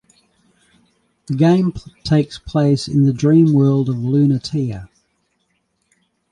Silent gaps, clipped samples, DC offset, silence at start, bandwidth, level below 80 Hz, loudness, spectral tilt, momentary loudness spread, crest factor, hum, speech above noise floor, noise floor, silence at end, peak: none; under 0.1%; under 0.1%; 1.3 s; 10.5 kHz; -48 dBFS; -16 LUFS; -8 dB/octave; 11 LU; 14 dB; none; 52 dB; -67 dBFS; 1.45 s; -2 dBFS